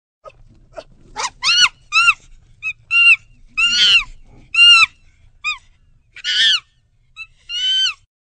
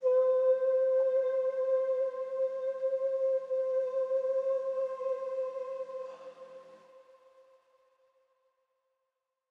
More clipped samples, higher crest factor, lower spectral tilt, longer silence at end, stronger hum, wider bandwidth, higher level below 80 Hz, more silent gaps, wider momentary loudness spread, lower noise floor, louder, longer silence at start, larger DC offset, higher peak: neither; about the same, 18 dB vs 14 dB; second, 2.5 dB/octave vs -4 dB/octave; second, 0.4 s vs 2.5 s; neither; first, 9.4 kHz vs 3.9 kHz; first, -48 dBFS vs under -90 dBFS; neither; first, 17 LU vs 13 LU; second, -56 dBFS vs -85 dBFS; first, -12 LUFS vs -31 LUFS; first, 0.25 s vs 0 s; neither; first, 0 dBFS vs -18 dBFS